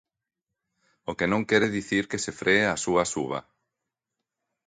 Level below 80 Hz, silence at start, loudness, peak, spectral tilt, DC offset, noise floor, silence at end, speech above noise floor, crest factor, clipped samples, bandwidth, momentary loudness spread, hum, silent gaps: -58 dBFS; 1.1 s; -25 LUFS; -6 dBFS; -4 dB/octave; under 0.1%; -86 dBFS; 1.3 s; 60 dB; 22 dB; under 0.1%; 9.6 kHz; 12 LU; none; none